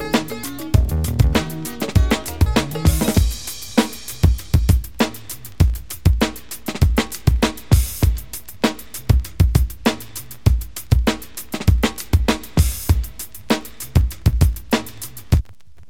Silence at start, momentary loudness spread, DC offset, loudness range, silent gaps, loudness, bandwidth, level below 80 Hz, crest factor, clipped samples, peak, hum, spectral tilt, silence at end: 0 s; 11 LU; 1%; 1 LU; none; -20 LUFS; 17.5 kHz; -22 dBFS; 18 dB; under 0.1%; 0 dBFS; none; -5.5 dB/octave; 0.5 s